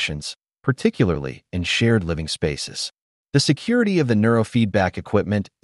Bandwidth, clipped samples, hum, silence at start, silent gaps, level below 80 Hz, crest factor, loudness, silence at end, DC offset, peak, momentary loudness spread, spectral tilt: 11.5 kHz; under 0.1%; none; 0 s; 3.02-3.25 s; -44 dBFS; 18 dB; -21 LUFS; 0.2 s; under 0.1%; -4 dBFS; 10 LU; -5.5 dB/octave